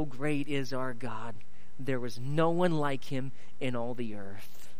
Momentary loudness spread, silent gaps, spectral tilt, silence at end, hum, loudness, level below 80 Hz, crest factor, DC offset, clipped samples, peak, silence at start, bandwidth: 16 LU; none; -6.5 dB/octave; 0.05 s; none; -34 LUFS; -66 dBFS; 20 dB; 4%; under 0.1%; -16 dBFS; 0 s; 15.5 kHz